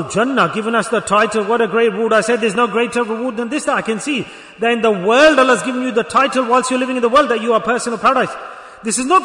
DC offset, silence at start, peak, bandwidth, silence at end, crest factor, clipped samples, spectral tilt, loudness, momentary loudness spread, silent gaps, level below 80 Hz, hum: under 0.1%; 0 s; 0 dBFS; 11 kHz; 0 s; 14 dB; under 0.1%; -3.5 dB/octave; -15 LUFS; 8 LU; none; -54 dBFS; none